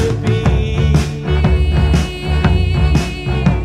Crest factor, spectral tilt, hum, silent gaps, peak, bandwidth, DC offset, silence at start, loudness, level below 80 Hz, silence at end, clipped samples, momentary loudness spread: 12 dB; -7 dB/octave; none; none; -2 dBFS; 11.5 kHz; under 0.1%; 0 s; -15 LUFS; -18 dBFS; 0 s; under 0.1%; 3 LU